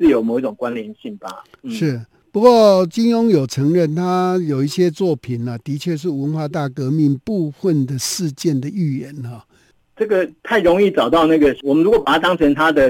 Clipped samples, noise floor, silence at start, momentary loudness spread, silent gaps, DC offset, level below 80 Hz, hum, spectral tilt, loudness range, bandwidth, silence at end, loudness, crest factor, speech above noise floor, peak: under 0.1%; -54 dBFS; 0 s; 13 LU; none; under 0.1%; -48 dBFS; none; -6 dB/octave; 5 LU; 17 kHz; 0 s; -17 LUFS; 16 dB; 38 dB; 0 dBFS